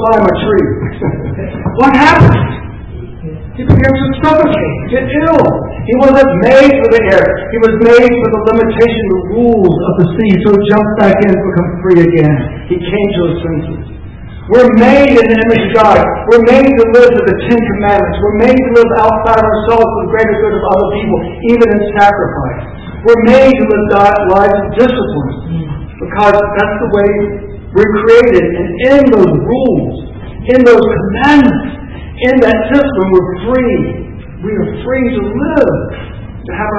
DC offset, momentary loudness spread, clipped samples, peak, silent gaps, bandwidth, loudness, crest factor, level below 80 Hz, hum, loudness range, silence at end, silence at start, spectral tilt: 0.3%; 14 LU; 4%; 0 dBFS; none; 8 kHz; -9 LUFS; 8 dB; -28 dBFS; none; 4 LU; 0 s; 0 s; -8 dB/octave